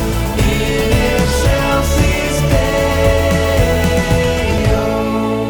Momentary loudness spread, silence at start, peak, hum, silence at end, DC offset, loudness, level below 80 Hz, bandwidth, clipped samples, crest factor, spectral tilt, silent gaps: 2 LU; 0 s; -2 dBFS; none; 0 s; under 0.1%; -14 LUFS; -20 dBFS; over 20 kHz; under 0.1%; 12 dB; -5.5 dB/octave; none